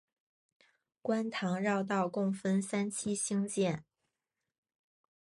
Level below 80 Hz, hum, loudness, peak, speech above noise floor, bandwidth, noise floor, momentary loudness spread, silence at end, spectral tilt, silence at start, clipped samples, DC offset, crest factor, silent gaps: -76 dBFS; none; -34 LUFS; -20 dBFS; 56 dB; 11.5 kHz; -89 dBFS; 3 LU; 1.6 s; -5 dB/octave; 1.05 s; under 0.1%; under 0.1%; 16 dB; none